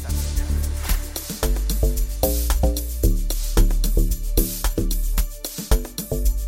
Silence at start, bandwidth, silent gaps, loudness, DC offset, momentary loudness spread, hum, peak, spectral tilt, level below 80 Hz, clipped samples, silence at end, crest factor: 0 s; 17 kHz; none; -24 LUFS; under 0.1%; 5 LU; none; -2 dBFS; -4.5 dB/octave; -22 dBFS; under 0.1%; 0 s; 18 dB